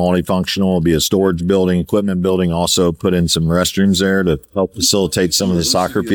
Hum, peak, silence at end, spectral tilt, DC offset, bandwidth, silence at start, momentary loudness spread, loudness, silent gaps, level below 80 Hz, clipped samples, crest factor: none; -2 dBFS; 0 s; -4.5 dB/octave; under 0.1%; over 20 kHz; 0 s; 3 LU; -15 LUFS; none; -38 dBFS; under 0.1%; 12 dB